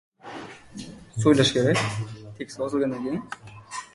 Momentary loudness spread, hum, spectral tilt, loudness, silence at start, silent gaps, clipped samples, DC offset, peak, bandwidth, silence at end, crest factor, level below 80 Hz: 21 LU; none; -5 dB/octave; -24 LUFS; 0.25 s; none; under 0.1%; under 0.1%; -6 dBFS; 11.5 kHz; 0.1 s; 20 dB; -56 dBFS